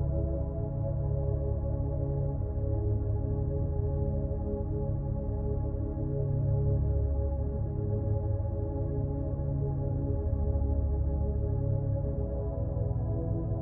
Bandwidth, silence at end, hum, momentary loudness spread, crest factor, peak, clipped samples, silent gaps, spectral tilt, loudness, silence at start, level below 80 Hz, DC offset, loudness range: 1.8 kHz; 0 s; none; 3 LU; 12 dB; -18 dBFS; under 0.1%; none; -15.5 dB/octave; -32 LUFS; 0 s; -34 dBFS; under 0.1%; 1 LU